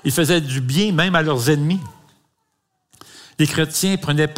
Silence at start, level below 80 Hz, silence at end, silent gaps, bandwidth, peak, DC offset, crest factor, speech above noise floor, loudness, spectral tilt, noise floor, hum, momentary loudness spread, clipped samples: 0.05 s; -52 dBFS; 0 s; none; 16 kHz; -2 dBFS; under 0.1%; 18 dB; 54 dB; -18 LUFS; -4.5 dB/octave; -71 dBFS; none; 6 LU; under 0.1%